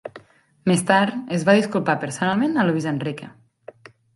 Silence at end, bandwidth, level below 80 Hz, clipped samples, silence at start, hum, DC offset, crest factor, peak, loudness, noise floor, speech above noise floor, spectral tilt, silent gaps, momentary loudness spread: 0.85 s; 11.5 kHz; -64 dBFS; under 0.1%; 0.05 s; none; under 0.1%; 20 dB; -2 dBFS; -21 LUFS; -49 dBFS; 29 dB; -5.5 dB/octave; none; 10 LU